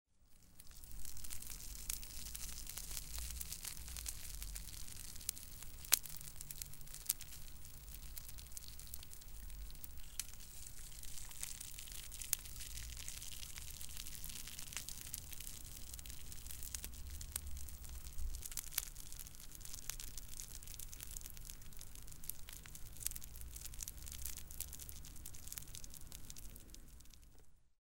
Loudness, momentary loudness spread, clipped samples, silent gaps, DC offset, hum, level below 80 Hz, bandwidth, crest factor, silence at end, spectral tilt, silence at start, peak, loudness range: -47 LUFS; 11 LU; under 0.1%; none; under 0.1%; none; -54 dBFS; 17 kHz; 46 dB; 0.15 s; -1 dB/octave; 0.2 s; -2 dBFS; 8 LU